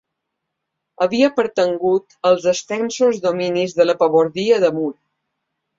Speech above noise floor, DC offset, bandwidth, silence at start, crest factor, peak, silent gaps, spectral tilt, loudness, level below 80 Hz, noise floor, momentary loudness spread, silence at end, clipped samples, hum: 61 dB; under 0.1%; 7.8 kHz; 1 s; 16 dB; -2 dBFS; none; -4.5 dB/octave; -18 LUFS; -64 dBFS; -78 dBFS; 5 LU; 0.85 s; under 0.1%; none